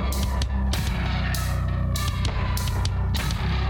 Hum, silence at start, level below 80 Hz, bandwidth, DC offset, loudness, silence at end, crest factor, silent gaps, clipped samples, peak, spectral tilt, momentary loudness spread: none; 0 s; -26 dBFS; 17.5 kHz; under 0.1%; -26 LUFS; 0 s; 12 dB; none; under 0.1%; -10 dBFS; -5 dB/octave; 1 LU